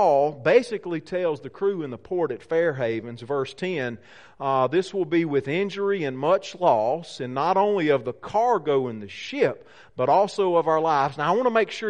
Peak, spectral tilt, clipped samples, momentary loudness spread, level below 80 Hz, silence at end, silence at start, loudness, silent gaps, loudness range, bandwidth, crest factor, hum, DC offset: -6 dBFS; -6 dB/octave; under 0.1%; 10 LU; -66 dBFS; 0 s; 0 s; -24 LUFS; none; 4 LU; 10 kHz; 18 dB; none; 0.2%